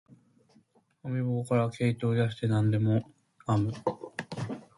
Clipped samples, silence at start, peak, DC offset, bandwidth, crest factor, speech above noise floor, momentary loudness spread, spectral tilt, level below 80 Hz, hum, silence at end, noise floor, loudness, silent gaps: under 0.1%; 1.05 s; -12 dBFS; under 0.1%; 11.5 kHz; 18 dB; 37 dB; 12 LU; -8 dB/octave; -62 dBFS; none; 0.2 s; -65 dBFS; -30 LUFS; none